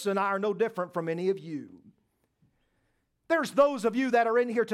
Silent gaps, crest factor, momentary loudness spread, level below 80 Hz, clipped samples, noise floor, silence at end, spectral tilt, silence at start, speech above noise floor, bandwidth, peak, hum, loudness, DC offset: none; 20 dB; 9 LU; -76 dBFS; under 0.1%; -75 dBFS; 0 s; -5.5 dB/octave; 0 s; 47 dB; 14 kHz; -10 dBFS; none; -27 LUFS; under 0.1%